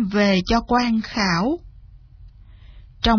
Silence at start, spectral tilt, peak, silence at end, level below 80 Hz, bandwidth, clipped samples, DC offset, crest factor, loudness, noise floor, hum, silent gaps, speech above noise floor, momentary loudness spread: 0 s; -5.5 dB/octave; -4 dBFS; 0 s; -36 dBFS; 5.4 kHz; under 0.1%; under 0.1%; 16 dB; -20 LUFS; -45 dBFS; none; none; 26 dB; 6 LU